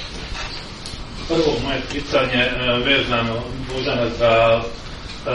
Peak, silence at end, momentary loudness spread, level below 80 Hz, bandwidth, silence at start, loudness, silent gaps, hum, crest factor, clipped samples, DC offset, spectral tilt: -4 dBFS; 0 s; 16 LU; -34 dBFS; 11.5 kHz; 0 s; -19 LUFS; none; none; 18 dB; under 0.1%; under 0.1%; -5 dB/octave